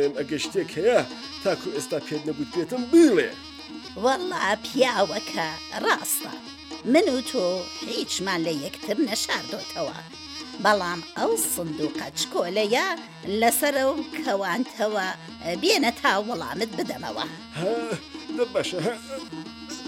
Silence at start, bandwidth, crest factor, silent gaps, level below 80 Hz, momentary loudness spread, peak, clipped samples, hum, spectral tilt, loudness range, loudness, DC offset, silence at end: 0 s; 17 kHz; 20 dB; none; -62 dBFS; 13 LU; -6 dBFS; under 0.1%; none; -3 dB/octave; 4 LU; -25 LUFS; under 0.1%; 0 s